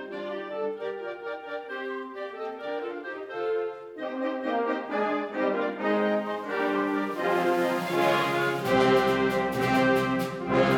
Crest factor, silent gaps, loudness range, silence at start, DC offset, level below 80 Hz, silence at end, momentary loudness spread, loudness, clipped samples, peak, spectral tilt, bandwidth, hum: 16 dB; none; 10 LU; 0 s; under 0.1%; -60 dBFS; 0 s; 12 LU; -28 LUFS; under 0.1%; -10 dBFS; -5.5 dB/octave; 18.5 kHz; none